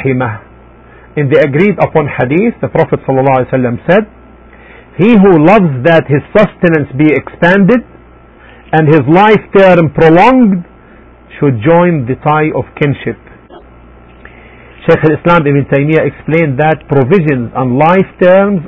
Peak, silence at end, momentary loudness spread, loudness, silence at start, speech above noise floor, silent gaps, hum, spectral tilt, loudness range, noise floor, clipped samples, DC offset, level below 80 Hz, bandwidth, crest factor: 0 dBFS; 0 s; 8 LU; -9 LUFS; 0 s; 29 dB; none; none; -9.5 dB/octave; 5 LU; -37 dBFS; 0.6%; under 0.1%; -38 dBFS; 8 kHz; 10 dB